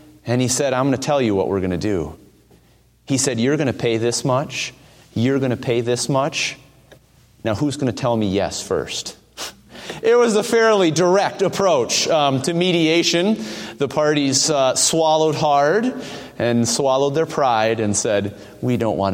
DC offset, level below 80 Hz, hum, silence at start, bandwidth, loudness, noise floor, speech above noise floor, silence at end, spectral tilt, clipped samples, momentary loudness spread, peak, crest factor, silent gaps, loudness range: under 0.1%; -52 dBFS; none; 0.25 s; 16.5 kHz; -18 LUFS; -54 dBFS; 36 dB; 0 s; -4 dB/octave; under 0.1%; 11 LU; -4 dBFS; 16 dB; none; 5 LU